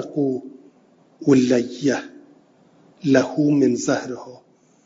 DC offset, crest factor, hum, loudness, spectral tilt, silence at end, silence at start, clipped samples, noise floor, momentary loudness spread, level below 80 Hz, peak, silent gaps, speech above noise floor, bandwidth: under 0.1%; 22 dB; none; -20 LUFS; -6 dB/octave; 0.5 s; 0 s; under 0.1%; -55 dBFS; 14 LU; -64 dBFS; 0 dBFS; none; 36 dB; 7.8 kHz